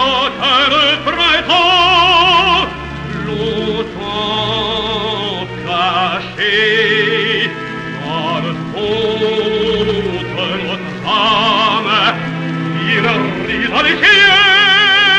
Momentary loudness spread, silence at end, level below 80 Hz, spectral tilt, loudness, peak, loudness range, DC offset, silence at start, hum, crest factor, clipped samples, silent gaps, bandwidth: 13 LU; 0 s; -40 dBFS; -4 dB/octave; -12 LUFS; 0 dBFS; 6 LU; under 0.1%; 0 s; none; 14 dB; under 0.1%; none; 10.5 kHz